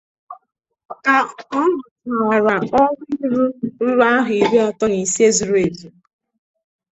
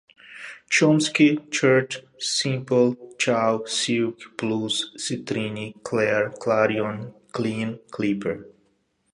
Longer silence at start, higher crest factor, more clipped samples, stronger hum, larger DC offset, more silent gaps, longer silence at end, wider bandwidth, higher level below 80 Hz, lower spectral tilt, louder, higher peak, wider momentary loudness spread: about the same, 0.3 s vs 0.3 s; about the same, 16 dB vs 20 dB; neither; neither; neither; first, 0.85-0.89 s, 1.91-1.96 s vs none; first, 1.05 s vs 0.65 s; second, 8.4 kHz vs 11.5 kHz; first, -56 dBFS vs -66 dBFS; about the same, -4 dB/octave vs -4.5 dB/octave; first, -17 LUFS vs -23 LUFS; about the same, -2 dBFS vs -4 dBFS; second, 8 LU vs 12 LU